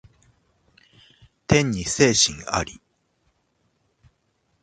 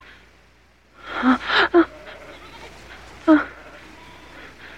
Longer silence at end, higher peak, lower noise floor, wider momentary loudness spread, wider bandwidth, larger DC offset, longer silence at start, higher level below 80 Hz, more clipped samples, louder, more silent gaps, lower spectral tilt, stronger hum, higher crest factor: first, 1.9 s vs 0 s; about the same, -2 dBFS vs -4 dBFS; first, -70 dBFS vs -55 dBFS; second, 14 LU vs 25 LU; about the same, 9.6 kHz vs 9 kHz; second, under 0.1% vs 0.2%; first, 1.5 s vs 1.05 s; about the same, -48 dBFS vs -52 dBFS; neither; about the same, -20 LUFS vs -19 LUFS; neither; about the same, -3.5 dB/octave vs -4.5 dB/octave; second, none vs 60 Hz at -50 dBFS; about the same, 24 dB vs 20 dB